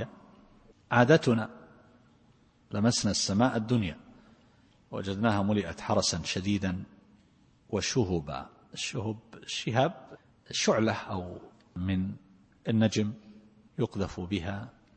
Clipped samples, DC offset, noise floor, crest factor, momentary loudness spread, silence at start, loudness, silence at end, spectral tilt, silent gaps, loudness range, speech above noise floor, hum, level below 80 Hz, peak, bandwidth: under 0.1%; under 0.1%; -63 dBFS; 24 dB; 16 LU; 0 s; -30 LUFS; 0.25 s; -5 dB/octave; none; 4 LU; 34 dB; none; -58 dBFS; -6 dBFS; 8.8 kHz